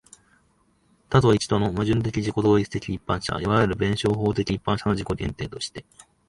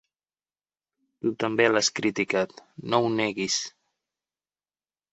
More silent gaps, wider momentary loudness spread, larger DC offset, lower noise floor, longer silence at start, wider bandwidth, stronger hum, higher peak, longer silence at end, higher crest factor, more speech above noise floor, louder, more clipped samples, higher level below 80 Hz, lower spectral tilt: neither; about the same, 10 LU vs 10 LU; neither; second, -64 dBFS vs under -90 dBFS; second, 1.1 s vs 1.25 s; first, 11.5 kHz vs 8.2 kHz; second, none vs 50 Hz at -60 dBFS; about the same, -4 dBFS vs -6 dBFS; second, 0.5 s vs 1.45 s; about the same, 20 dB vs 24 dB; second, 41 dB vs over 65 dB; about the same, -24 LUFS vs -25 LUFS; neither; first, -44 dBFS vs -70 dBFS; first, -6.5 dB/octave vs -3 dB/octave